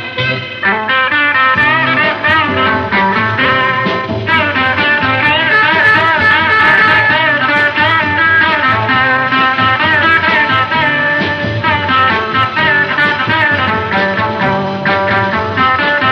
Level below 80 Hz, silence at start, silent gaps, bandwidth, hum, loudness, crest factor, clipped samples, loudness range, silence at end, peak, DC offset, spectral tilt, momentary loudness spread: -44 dBFS; 0 s; none; 9.4 kHz; none; -10 LUFS; 12 dB; under 0.1%; 3 LU; 0 s; 0 dBFS; under 0.1%; -6 dB/octave; 6 LU